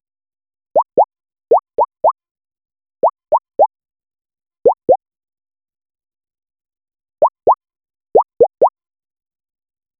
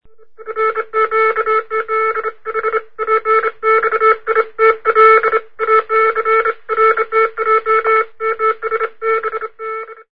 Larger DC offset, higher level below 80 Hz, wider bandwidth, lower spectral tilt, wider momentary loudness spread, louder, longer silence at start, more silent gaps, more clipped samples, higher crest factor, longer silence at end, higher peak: second, under 0.1% vs 1%; about the same, -60 dBFS vs -56 dBFS; second, 1.7 kHz vs 5.2 kHz; first, -12 dB/octave vs -5 dB/octave; second, 5 LU vs 9 LU; about the same, -16 LUFS vs -14 LUFS; first, 0.75 s vs 0 s; first, 2.31-2.35 s vs none; neither; about the same, 18 dB vs 16 dB; first, 1.3 s vs 0 s; about the same, 0 dBFS vs 0 dBFS